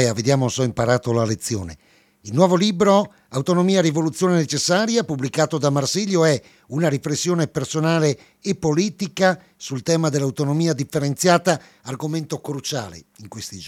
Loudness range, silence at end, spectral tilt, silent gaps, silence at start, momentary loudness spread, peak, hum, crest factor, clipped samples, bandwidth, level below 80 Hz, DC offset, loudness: 3 LU; 0 s; -5 dB/octave; none; 0 s; 11 LU; 0 dBFS; none; 20 dB; under 0.1%; 15.5 kHz; -56 dBFS; under 0.1%; -20 LUFS